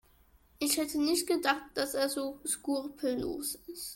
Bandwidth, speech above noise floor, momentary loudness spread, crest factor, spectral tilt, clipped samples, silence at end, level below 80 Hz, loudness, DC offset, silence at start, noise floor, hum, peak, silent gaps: 17 kHz; 31 dB; 6 LU; 22 dB; -2 dB/octave; under 0.1%; 0 s; -62 dBFS; -32 LUFS; under 0.1%; 0.6 s; -64 dBFS; none; -12 dBFS; none